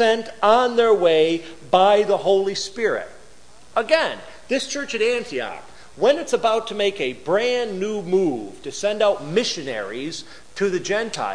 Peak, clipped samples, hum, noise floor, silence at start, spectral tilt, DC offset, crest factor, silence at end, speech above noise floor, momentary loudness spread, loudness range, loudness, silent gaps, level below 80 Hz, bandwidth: -2 dBFS; under 0.1%; none; -50 dBFS; 0 s; -3.5 dB/octave; 0.8%; 18 dB; 0 s; 30 dB; 12 LU; 5 LU; -21 LUFS; none; -58 dBFS; 10.5 kHz